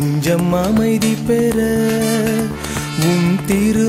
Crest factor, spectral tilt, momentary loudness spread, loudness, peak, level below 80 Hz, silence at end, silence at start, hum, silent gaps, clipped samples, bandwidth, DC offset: 14 dB; -5.5 dB/octave; 4 LU; -16 LUFS; -2 dBFS; -38 dBFS; 0 s; 0 s; none; none; under 0.1%; 16.5 kHz; under 0.1%